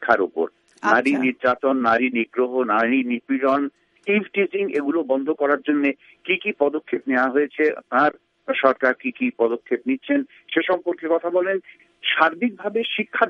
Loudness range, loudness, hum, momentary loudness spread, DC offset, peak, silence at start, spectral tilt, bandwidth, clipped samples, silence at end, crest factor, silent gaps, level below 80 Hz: 2 LU; -21 LUFS; none; 6 LU; under 0.1%; 0 dBFS; 0 s; -6 dB/octave; 8.8 kHz; under 0.1%; 0 s; 20 dB; none; -68 dBFS